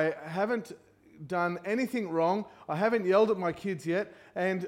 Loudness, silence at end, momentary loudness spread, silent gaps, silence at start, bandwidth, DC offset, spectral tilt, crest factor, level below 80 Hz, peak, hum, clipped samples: -30 LUFS; 0 s; 10 LU; none; 0 s; 16.5 kHz; under 0.1%; -6.5 dB/octave; 18 dB; -72 dBFS; -12 dBFS; none; under 0.1%